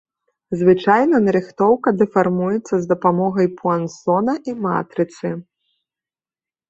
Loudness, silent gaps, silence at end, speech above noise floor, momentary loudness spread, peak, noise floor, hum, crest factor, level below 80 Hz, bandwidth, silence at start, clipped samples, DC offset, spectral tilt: -18 LUFS; none; 1.25 s; over 73 dB; 9 LU; -2 dBFS; under -90 dBFS; none; 16 dB; -60 dBFS; 8 kHz; 0.5 s; under 0.1%; under 0.1%; -7.5 dB/octave